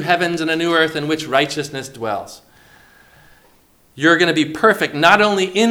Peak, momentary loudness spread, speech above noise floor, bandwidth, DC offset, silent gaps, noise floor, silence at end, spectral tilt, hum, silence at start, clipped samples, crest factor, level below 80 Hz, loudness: 0 dBFS; 12 LU; 37 dB; 20 kHz; under 0.1%; none; -53 dBFS; 0 s; -4 dB/octave; none; 0 s; under 0.1%; 18 dB; -58 dBFS; -16 LUFS